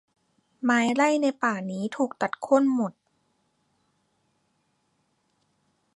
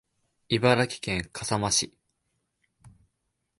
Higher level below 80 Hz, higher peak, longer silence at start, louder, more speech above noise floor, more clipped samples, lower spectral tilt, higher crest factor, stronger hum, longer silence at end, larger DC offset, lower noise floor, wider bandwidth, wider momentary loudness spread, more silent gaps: second, -80 dBFS vs -54 dBFS; about the same, -8 dBFS vs -8 dBFS; about the same, 0.6 s vs 0.5 s; about the same, -25 LUFS vs -26 LUFS; second, 48 dB vs 53 dB; neither; first, -5 dB/octave vs -3.5 dB/octave; about the same, 20 dB vs 22 dB; neither; first, 3.05 s vs 0.7 s; neither; second, -72 dBFS vs -79 dBFS; about the same, 11 kHz vs 11.5 kHz; about the same, 9 LU vs 8 LU; neither